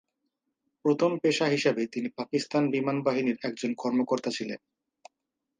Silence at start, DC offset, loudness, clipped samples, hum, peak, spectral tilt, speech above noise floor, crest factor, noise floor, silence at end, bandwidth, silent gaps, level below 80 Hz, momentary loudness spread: 0.85 s; under 0.1%; -28 LUFS; under 0.1%; none; -12 dBFS; -5.5 dB/octave; 57 dB; 18 dB; -85 dBFS; 1.05 s; 9.8 kHz; none; -78 dBFS; 8 LU